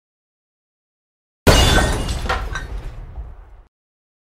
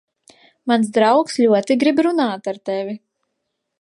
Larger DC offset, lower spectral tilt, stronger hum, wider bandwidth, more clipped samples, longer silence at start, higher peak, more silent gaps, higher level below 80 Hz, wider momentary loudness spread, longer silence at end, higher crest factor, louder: neither; about the same, -4 dB/octave vs -5 dB/octave; neither; first, 16 kHz vs 11.5 kHz; neither; first, 1.45 s vs 0.65 s; about the same, 0 dBFS vs -2 dBFS; neither; first, -26 dBFS vs -72 dBFS; first, 23 LU vs 12 LU; second, 0.65 s vs 0.85 s; first, 22 dB vs 16 dB; about the same, -18 LUFS vs -17 LUFS